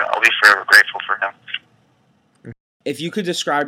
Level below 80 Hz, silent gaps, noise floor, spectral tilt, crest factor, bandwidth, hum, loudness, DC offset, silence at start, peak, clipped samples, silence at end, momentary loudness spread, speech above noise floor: -70 dBFS; 2.60-2.80 s; -59 dBFS; -2 dB/octave; 18 dB; over 20 kHz; none; -14 LUFS; under 0.1%; 0 s; 0 dBFS; under 0.1%; 0 s; 19 LU; 43 dB